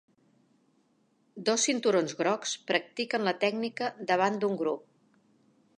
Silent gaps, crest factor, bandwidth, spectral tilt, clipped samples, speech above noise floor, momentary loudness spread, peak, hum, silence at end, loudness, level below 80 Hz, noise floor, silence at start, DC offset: none; 20 dB; 11 kHz; -3 dB/octave; under 0.1%; 41 dB; 7 LU; -10 dBFS; none; 1 s; -29 LUFS; -84 dBFS; -70 dBFS; 1.35 s; under 0.1%